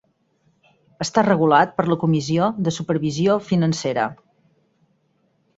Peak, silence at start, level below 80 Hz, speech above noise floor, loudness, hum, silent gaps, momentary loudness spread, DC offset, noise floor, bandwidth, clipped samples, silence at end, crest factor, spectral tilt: 0 dBFS; 1 s; -60 dBFS; 46 dB; -20 LUFS; none; none; 8 LU; under 0.1%; -65 dBFS; 8 kHz; under 0.1%; 1.45 s; 20 dB; -6 dB/octave